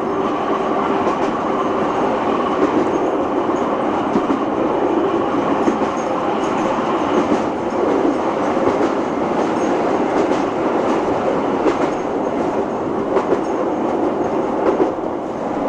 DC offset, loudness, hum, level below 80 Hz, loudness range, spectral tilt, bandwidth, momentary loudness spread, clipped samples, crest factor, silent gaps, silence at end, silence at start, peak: under 0.1%; -18 LUFS; none; -48 dBFS; 1 LU; -6 dB/octave; 10 kHz; 3 LU; under 0.1%; 16 dB; none; 0 s; 0 s; -2 dBFS